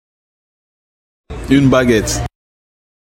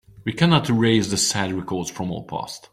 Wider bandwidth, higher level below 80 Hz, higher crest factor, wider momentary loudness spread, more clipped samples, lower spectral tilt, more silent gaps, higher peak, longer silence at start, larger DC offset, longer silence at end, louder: about the same, 16.5 kHz vs 15.5 kHz; first, -32 dBFS vs -52 dBFS; about the same, 18 dB vs 18 dB; first, 19 LU vs 12 LU; neither; about the same, -5.5 dB/octave vs -4.5 dB/octave; neither; first, 0 dBFS vs -4 dBFS; first, 1.3 s vs 0.15 s; neither; first, 0.95 s vs 0.15 s; first, -13 LUFS vs -21 LUFS